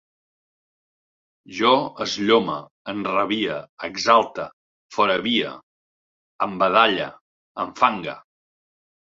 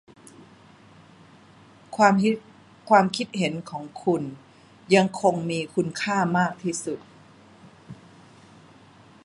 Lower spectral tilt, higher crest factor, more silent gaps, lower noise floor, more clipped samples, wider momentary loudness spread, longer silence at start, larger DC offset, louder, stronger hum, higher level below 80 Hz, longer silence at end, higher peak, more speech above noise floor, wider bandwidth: second, -4 dB/octave vs -5.5 dB/octave; about the same, 22 dB vs 22 dB; first, 2.71-2.85 s, 3.69-3.77 s, 4.53-4.89 s, 5.63-6.39 s, 7.21-7.55 s vs none; first, under -90 dBFS vs -52 dBFS; neither; second, 15 LU vs 18 LU; second, 1.5 s vs 1.9 s; neither; about the same, -21 LUFS vs -23 LUFS; neither; about the same, -64 dBFS vs -68 dBFS; second, 0.95 s vs 1.3 s; about the same, -2 dBFS vs -4 dBFS; first, over 69 dB vs 29 dB; second, 7.8 kHz vs 11.5 kHz